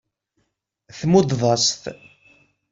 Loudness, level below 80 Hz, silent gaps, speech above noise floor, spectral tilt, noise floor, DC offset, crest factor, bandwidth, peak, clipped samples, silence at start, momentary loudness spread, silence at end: -19 LUFS; -56 dBFS; none; 54 dB; -4.5 dB/octave; -73 dBFS; under 0.1%; 20 dB; 7.8 kHz; -4 dBFS; under 0.1%; 0.95 s; 14 LU; 0.8 s